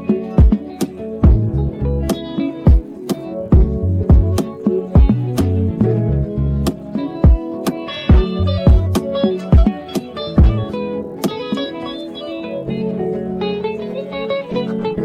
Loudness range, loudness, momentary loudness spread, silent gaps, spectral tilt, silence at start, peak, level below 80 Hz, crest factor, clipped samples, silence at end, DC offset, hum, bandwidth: 7 LU; -17 LUFS; 11 LU; none; -8 dB/octave; 0 s; -2 dBFS; -18 dBFS; 12 dB; under 0.1%; 0 s; under 0.1%; none; 14.5 kHz